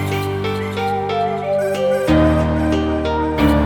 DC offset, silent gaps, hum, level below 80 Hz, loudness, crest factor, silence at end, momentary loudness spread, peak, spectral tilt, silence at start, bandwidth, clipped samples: under 0.1%; none; none; -28 dBFS; -18 LUFS; 14 dB; 0 s; 7 LU; -4 dBFS; -7 dB/octave; 0 s; 19 kHz; under 0.1%